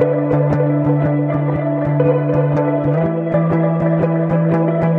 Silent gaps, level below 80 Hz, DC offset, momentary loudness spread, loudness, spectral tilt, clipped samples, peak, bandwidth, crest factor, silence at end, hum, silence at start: none; -46 dBFS; under 0.1%; 2 LU; -16 LUFS; -11.5 dB/octave; under 0.1%; -2 dBFS; 3.7 kHz; 12 dB; 0 s; none; 0 s